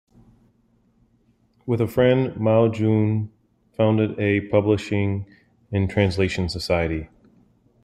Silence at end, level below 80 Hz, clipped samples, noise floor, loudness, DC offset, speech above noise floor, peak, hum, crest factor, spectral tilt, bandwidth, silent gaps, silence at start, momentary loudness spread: 0.75 s; -48 dBFS; under 0.1%; -62 dBFS; -22 LUFS; under 0.1%; 42 dB; -4 dBFS; none; 18 dB; -7.5 dB/octave; 13.5 kHz; none; 1.65 s; 12 LU